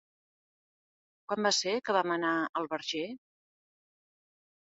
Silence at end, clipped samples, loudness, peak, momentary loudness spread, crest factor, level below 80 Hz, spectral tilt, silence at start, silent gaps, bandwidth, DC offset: 1.5 s; under 0.1%; -31 LUFS; -14 dBFS; 10 LU; 22 dB; -82 dBFS; -1.5 dB/octave; 1.3 s; 2.49-2.53 s; 7.6 kHz; under 0.1%